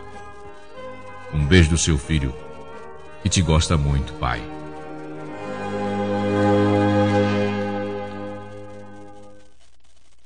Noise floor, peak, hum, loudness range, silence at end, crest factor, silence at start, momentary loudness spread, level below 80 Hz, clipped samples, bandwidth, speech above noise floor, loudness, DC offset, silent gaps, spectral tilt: -59 dBFS; 0 dBFS; none; 4 LU; 0.95 s; 22 dB; 0 s; 22 LU; -34 dBFS; under 0.1%; 10 kHz; 40 dB; -21 LUFS; 1%; none; -5.5 dB/octave